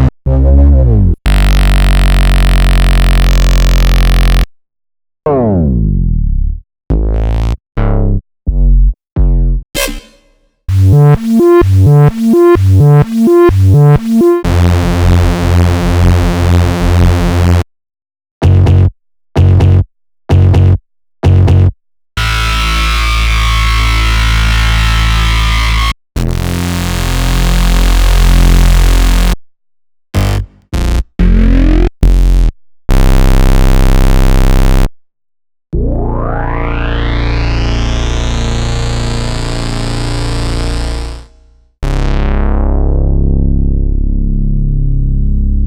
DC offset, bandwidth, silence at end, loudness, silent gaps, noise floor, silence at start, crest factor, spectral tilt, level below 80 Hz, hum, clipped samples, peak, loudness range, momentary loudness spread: under 0.1%; 18.5 kHz; 0 s; -11 LUFS; 9.12-9.16 s, 18.31-18.41 s; -51 dBFS; 0 s; 8 dB; -6.5 dB/octave; -12 dBFS; none; under 0.1%; 0 dBFS; 8 LU; 10 LU